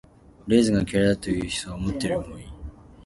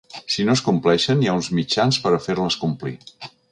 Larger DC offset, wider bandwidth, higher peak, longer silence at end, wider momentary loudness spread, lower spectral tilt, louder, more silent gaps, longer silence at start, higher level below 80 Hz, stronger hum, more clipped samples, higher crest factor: neither; about the same, 11.5 kHz vs 11 kHz; about the same, -6 dBFS vs -4 dBFS; second, 0.05 s vs 0.25 s; first, 21 LU vs 14 LU; about the same, -5.5 dB/octave vs -5 dB/octave; second, -24 LUFS vs -20 LUFS; neither; first, 0.45 s vs 0.15 s; first, -42 dBFS vs -54 dBFS; neither; neither; about the same, 18 dB vs 16 dB